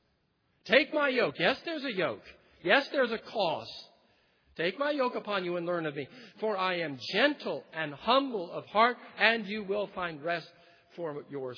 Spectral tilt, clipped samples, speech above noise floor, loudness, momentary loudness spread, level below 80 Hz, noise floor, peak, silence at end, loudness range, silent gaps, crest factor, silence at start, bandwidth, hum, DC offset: -5.5 dB/octave; under 0.1%; 43 dB; -30 LUFS; 12 LU; -74 dBFS; -74 dBFS; -6 dBFS; 0 s; 4 LU; none; 24 dB; 0.65 s; 5.4 kHz; none; under 0.1%